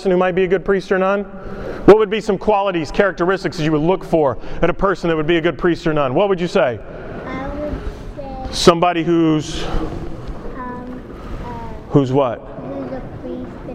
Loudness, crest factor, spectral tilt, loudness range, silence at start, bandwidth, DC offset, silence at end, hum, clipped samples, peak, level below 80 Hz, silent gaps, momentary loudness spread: -17 LUFS; 18 dB; -6 dB/octave; 6 LU; 0 s; 12 kHz; under 0.1%; 0 s; none; under 0.1%; 0 dBFS; -34 dBFS; none; 16 LU